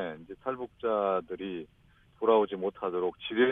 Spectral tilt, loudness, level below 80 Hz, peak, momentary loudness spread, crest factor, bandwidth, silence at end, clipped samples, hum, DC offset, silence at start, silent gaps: -8 dB/octave; -31 LUFS; -66 dBFS; -12 dBFS; 13 LU; 20 dB; 3.9 kHz; 0 s; under 0.1%; none; under 0.1%; 0 s; none